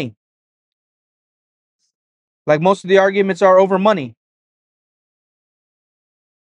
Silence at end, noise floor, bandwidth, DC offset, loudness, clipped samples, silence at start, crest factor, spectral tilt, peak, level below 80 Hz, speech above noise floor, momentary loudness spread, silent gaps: 2.45 s; under -90 dBFS; 9 kHz; under 0.1%; -14 LUFS; under 0.1%; 0 s; 20 dB; -6.5 dB/octave; 0 dBFS; -70 dBFS; over 77 dB; 16 LU; 0.17-1.79 s, 1.95-2.45 s